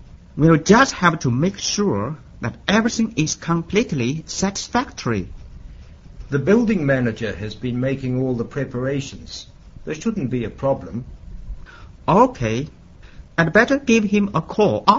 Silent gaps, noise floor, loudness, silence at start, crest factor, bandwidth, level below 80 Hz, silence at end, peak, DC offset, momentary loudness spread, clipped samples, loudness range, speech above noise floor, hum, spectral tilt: none; -41 dBFS; -20 LUFS; 0 s; 20 dB; 7.8 kHz; -42 dBFS; 0 s; 0 dBFS; under 0.1%; 17 LU; under 0.1%; 7 LU; 22 dB; none; -5.5 dB/octave